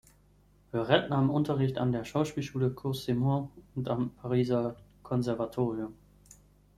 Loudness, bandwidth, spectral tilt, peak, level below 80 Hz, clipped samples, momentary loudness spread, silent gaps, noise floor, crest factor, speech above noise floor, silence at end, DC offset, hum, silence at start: -31 LUFS; 14 kHz; -7.5 dB/octave; -8 dBFS; -58 dBFS; under 0.1%; 10 LU; none; -63 dBFS; 22 dB; 33 dB; 0.85 s; under 0.1%; 50 Hz at -55 dBFS; 0.75 s